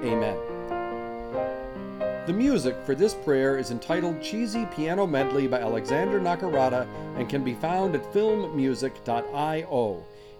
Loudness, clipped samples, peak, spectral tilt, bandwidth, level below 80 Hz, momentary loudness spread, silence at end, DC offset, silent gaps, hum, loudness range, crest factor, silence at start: -27 LUFS; under 0.1%; -10 dBFS; -6 dB/octave; 16.5 kHz; -54 dBFS; 8 LU; 0 s; under 0.1%; none; none; 1 LU; 16 dB; 0 s